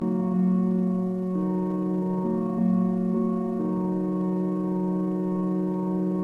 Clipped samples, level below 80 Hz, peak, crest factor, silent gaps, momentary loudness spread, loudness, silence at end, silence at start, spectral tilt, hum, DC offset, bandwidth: under 0.1%; -62 dBFS; -14 dBFS; 10 dB; none; 3 LU; -26 LUFS; 0 s; 0 s; -11.5 dB/octave; none; under 0.1%; 2.7 kHz